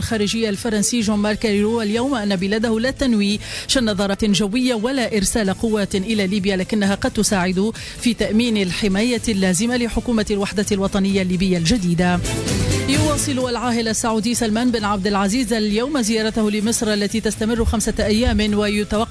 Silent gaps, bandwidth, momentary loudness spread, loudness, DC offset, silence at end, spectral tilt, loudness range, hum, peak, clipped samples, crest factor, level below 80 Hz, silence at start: none; 11 kHz; 3 LU; -19 LUFS; under 0.1%; 0 s; -4.5 dB/octave; 1 LU; none; -6 dBFS; under 0.1%; 12 dB; -34 dBFS; 0 s